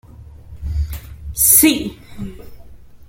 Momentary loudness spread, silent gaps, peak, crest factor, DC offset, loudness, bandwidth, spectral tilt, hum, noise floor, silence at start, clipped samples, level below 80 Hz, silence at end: 23 LU; none; 0 dBFS; 20 dB; under 0.1%; -13 LUFS; 17 kHz; -3 dB/octave; none; -38 dBFS; 0.15 s; under 0.1%; -32 dBFS; 0.05 s